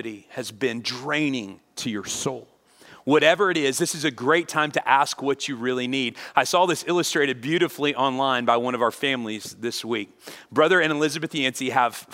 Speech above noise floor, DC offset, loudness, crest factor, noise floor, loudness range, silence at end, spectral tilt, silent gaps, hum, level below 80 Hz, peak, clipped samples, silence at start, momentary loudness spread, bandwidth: 27 dB; under 0.1%; -23 LUFS; 22 dB; -51 dBFS; 2 LU; 0 s; -3.5 dB/octave; none; none; -72 dBFS; -2 dBFS; under 0.1%; 0 s; 12 LU; 16 kHz